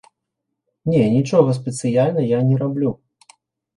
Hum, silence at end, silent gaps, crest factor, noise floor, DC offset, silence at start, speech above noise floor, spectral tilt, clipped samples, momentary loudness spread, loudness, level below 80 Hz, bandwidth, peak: none; 0.8 s; none; 18 dB; -79 dBFS; under 0.1%; 0.85 s; 62 dB; -7.5 dB/octave; under 0.1%; 8 LU; -18 LUFS; -56 dBFS; 11.5 kHz; -2 dBFS